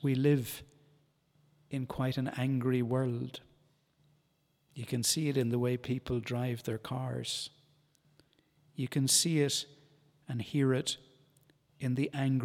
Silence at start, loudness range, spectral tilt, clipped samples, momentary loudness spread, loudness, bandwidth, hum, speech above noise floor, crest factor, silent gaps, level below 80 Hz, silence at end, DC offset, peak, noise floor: 0 s; 4 LU; -4.5 dB/octave; under 0.1%; 13 LU; -33 LUFS; 16.5 kHz; none; 42 dB; 20 dB; none; -64 dBFS; 0 s; under 0.1%; -14 dBFS; -74 dBFS